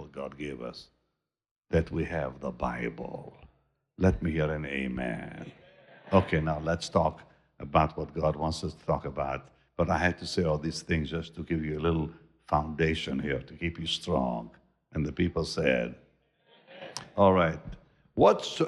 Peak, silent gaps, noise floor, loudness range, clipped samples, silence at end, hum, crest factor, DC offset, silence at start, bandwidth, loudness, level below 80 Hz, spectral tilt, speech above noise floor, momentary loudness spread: -10 dBFS; 1.51-1.56 s; -82 dBFS; 4 LU; under 0.1%; 0 s; none; 20 dB; under 0.1%; 0 s; 11.5 kHz; -30 LUFS; -48 dBFS; -6 dB/octave; 53 dB; 16 LU